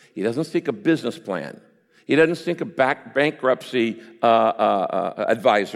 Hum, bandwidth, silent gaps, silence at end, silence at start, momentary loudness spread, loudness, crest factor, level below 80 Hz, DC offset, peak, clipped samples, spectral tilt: none; 13.5 kHz; none; 0 s; 0.15 s; 9 LU; -21 LUFS; 18 dB; -70 dBFS; under 0.1%; -4 dBFS; under 0.1%; -6 dB/octave